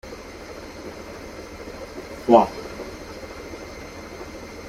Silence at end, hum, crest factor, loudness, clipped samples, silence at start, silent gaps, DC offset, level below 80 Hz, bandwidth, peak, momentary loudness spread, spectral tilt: 0 s; none; 24 dB; -23 LUFS; under 0.1%; 0.05 s; none; under 0.1%; -48 dBFS; 16 kHz; -2 dBFS; 21 LU; -5.5 dB/octave